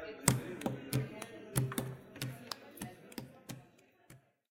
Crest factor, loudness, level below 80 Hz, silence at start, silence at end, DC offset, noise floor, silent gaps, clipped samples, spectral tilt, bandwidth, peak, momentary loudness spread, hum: 36 dB; -39 LUFS; -62 dBFS; 0 s; 0.35 s; under 0.1%; -64 dBFS; none; under 0.1%; -4.5 dB/octave; 17 kHz; -4 dBFS; 17 LU; none